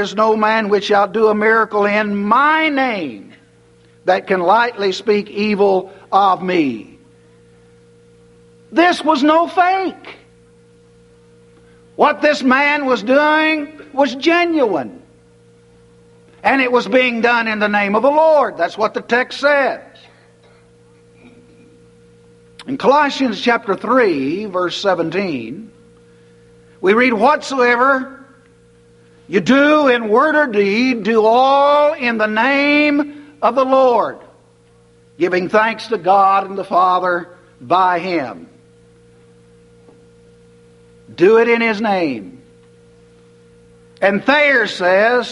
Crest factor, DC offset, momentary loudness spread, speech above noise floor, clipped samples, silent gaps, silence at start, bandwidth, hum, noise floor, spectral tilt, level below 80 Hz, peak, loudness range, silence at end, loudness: 16 dB; under 0.1%; 9 LU; 36 dB; under 0.1%; none; 0 s; 11.5 kHz; none; -50 dBFS; -5 dB/octave; -60 dBFS; 0 dBFS; 6 LU; 0 s; -14 LUFS